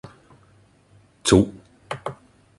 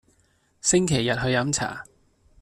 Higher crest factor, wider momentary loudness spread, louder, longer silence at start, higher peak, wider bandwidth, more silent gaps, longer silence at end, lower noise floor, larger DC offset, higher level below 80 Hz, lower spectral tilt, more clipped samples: about the same, 22 dB vs 18 dB; first, 18 LU vs 9 LU; about the same, -22 LUFS vs -23 LUFS; first, 1.25 s vs 0.65 s; first, -2 dBFS vs -8 dBFS; second, 11.5 kHz vs 14 kHz; neither; second, 0.45 s vs 0.6 s; second, -56 dBFS vs -65 dBFS; neither; first, -44 dBFS vs -50 dBFS; about the same, -5 dB/octave vs -4 dB/octave; neither